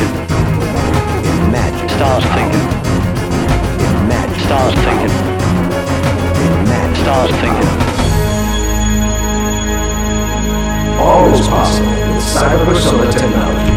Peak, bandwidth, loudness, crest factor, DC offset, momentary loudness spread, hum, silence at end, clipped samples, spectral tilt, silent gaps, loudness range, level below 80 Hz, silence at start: 0 dBFS; 17.5 kHz; -13 LUFS; 12 dB; under 0.1%; 5 LU; none; 0 s; under 0.1%; -5.5 dB/octave; none; 2 LU; -20 dBFS; 0 s